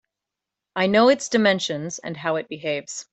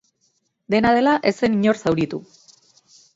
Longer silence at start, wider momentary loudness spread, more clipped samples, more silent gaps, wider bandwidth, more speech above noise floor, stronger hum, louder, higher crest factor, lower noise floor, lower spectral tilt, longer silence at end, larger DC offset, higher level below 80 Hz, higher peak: about the same, 0.75 s vs 0.7 s; first, 12 LU vs 8 LU; neither; neither; about the same, 8.4 kHz vs 7.8 kHz; first, 64 dB vs 49 dB; neither; second, -22 LUFS vs -19 LUFS; about the same, 18 dB vs 18 dB; first, -86 dBFS vs -68 dBFS; second, -4 dB/octave vs -6 dB/octave; second, 0.1 s vs 0.95 s; neither; second, -68 dBFS vs -54 dBFS; about the same, -4 dBFS vs -4 dBFS